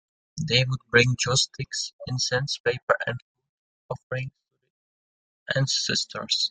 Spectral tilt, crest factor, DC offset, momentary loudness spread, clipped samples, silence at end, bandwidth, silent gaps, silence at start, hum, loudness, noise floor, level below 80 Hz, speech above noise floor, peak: -3 dB/octave; 22 dB; under 0.1%; 15 LU; under 0.1%; 0 s; 9.6 kHz; 1.93-1.99 s, 2.60-2.64 s, 2.83-2.87 s, 3.22-3.35 s, 3.49-3.89 s, 4.03-4.10 s, 4.70-5.46 s; 0.35 s; none; -25 LUFS; under -90 dBFS; -58 dBFS; over 65 dB; -4 dBFS